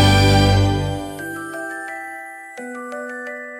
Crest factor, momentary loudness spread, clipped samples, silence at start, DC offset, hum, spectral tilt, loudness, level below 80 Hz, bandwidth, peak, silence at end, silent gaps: 16 dB; 18 LU; under 0.1%; 0 s; under 0.1%; none; -5.5 dB/octave; -20 LUFS; -32 dBFS; 16 kHz; -2 dBFS; 0 s; none